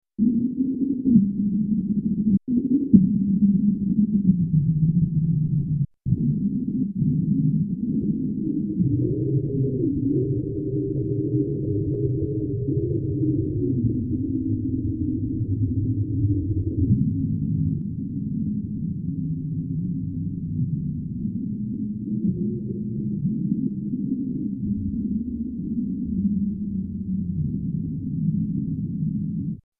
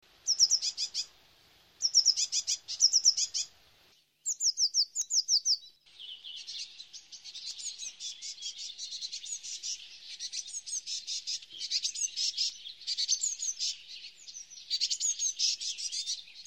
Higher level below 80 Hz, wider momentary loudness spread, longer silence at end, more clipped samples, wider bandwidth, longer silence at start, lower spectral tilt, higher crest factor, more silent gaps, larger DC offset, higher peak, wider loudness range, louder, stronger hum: first, -42 dBFS vs -80 dBFS; second, 8 LU vs 19 LU; first, 0.2 s vs 0.05 s; neither; second, 0.7 kHz vs 16.5 kHz; about the same, 0.2 s vs 0.25 s; first, -16.5 dB/octave vs 5.5 dB/octave; about the same, 22 dB vs 22 dB; neither; neither; first, -2 dBFS vs -12 dBFS; second, 7 LU vs 12 LU; first, -24 LUFS vs -29 LUFS; neither